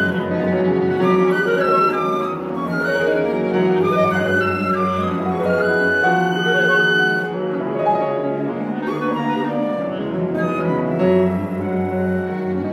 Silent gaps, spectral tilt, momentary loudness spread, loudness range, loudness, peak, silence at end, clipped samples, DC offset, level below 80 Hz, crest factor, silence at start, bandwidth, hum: none; -7 dB/octave; 7 LU; 4 LU; -18 LUFS; -4 dBFS; 0 s; under 0.1%; under 0.1%; -56 dBFS; 14 dB; 0 s; 13 kHz; none